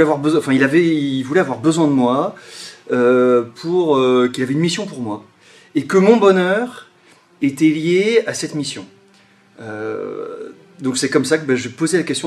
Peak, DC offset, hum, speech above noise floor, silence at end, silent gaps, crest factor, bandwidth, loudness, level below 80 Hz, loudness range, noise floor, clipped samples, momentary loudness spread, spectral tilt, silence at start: 0 dBFS; under 0.1%; none; 35 dB; 0 s; none; 16 dB; 13 kHz; -17 LUFS; -64 dBFS; 6 LU; -51 dBFS; under 0.1%; 15 LU; -5.5 dB/octave; 0 s